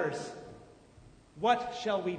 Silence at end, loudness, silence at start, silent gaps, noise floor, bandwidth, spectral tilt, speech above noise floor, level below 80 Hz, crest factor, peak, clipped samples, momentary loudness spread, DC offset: 0 s; -32 LUFS; 0 s; none; -57 dBFS; 9.6 kHz; -4.5 dB/octave; 26 dB; -66 dBFS; 20 dB; -14 dBFS; under 0.1%; 21 LU; under 0.1%